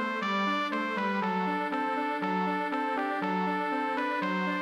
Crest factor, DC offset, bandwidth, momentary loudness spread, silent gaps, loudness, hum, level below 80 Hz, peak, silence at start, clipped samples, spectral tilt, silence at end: 12 dB; under 0.1%; 12 kHz; 2 LU; none; -30 LUFS; none; -84 dBFS; -18 dBFS; 0 s; under 0.1%; -6 dB/octave; 0 s